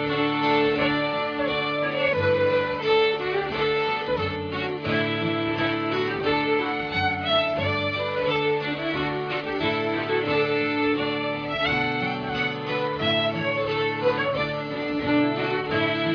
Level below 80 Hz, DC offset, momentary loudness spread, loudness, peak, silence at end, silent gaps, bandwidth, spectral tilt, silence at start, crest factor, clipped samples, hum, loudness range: -54 dBFS; under 0.1%; 5 LU; -24 LUFS; -10 dBFS; 0 s; none; 5.4 kHz; -7 dB/octave; 0 s; 14 dB; under 0.1%; none; 2 LU